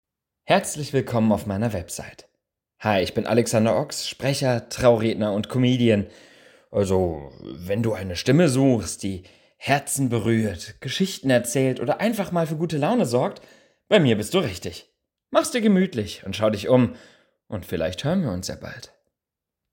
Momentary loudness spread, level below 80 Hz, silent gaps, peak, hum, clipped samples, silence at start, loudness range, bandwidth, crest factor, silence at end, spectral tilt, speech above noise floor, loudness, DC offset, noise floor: 14 LU; -52 dBFS; none; -4 dBFS; none; under 0.1%; 0.5 s; 2 LU; 17 kHz; 20 dB; 0.85 s; -5.5 dB/octave; 64 dB; -23 LUFS; under 0.1%; -86 dBFS